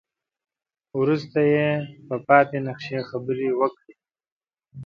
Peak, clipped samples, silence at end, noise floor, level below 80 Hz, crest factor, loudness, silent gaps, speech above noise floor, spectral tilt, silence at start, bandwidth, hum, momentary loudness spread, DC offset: -2 dBFS; under 0.1%; 0 s; -56 dBFS; -68 dBFS; 22 dB; -23 LUFS; 4.32-4.40 s; 34 dB; -8.5 dB/octave; 0.95 s; 6.8 kHz; none; 12 LU; under 0.1%